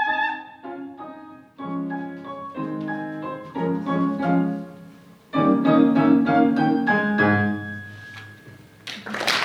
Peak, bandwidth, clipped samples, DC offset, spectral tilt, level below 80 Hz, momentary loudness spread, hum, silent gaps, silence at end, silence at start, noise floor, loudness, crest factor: -4 dBFS; 13.5 kHz; under 0.1%; under 0.1%; -6 dB/octave; -68 dBFS; 21 LU; none; none; 0 s; 0 s; -47 dBFS; -22 LUFS; 20 dB